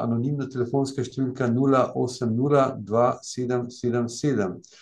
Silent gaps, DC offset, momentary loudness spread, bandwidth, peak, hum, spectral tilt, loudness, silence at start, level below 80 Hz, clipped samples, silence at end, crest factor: none; under 0.1%; 7 LU; 10.5 kHz; -6 dBFS; none; -7 dB/octave; -25 LUFS; 0 s; -66 dBFS; under 0.1%; 0.2 s; 18 dB